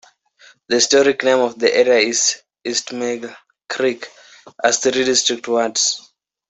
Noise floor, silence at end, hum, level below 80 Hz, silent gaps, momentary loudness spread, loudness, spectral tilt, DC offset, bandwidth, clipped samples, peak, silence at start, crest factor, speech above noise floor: -50 dBFS; 0.5 s; none; -64 dBFS; none; 14 LU; -17 LUFS; -1 dB/octave; under 0.1%; 8.4 kHz; under 0.1%; -2 dBFS; 0.7 s; 18 dB; 33 dB